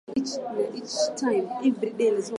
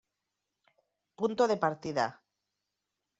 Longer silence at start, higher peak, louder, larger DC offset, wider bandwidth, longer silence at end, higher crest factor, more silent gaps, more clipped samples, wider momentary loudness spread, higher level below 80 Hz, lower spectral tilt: second, 0.1 s vs 1.2 s; about the same, -12 dBFS vs -14 dBFS; first, -27 LUFS vs -31 LUFS; neither; first, 11.5 kHz vs 8 kHz; second, 0 s vs 1.05 s; second, 14 dB vs 22 dB; neither; neither; about the same, 5 LU vs 7 LU; first, -70 dBFS vs -76 dBFS; about the same, -4 dB/octave vs -4 dB/octave